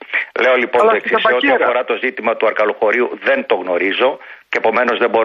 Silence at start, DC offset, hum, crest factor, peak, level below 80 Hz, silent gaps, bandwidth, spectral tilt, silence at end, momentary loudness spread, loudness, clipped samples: 0 s; under 0.1%; none; 14 dB; -2 dBFS; -64 dBFS; none; 9.4 kHz; -4.5 dB/octave; 0 s; 5 LU; -15 LUFS; under 0.1%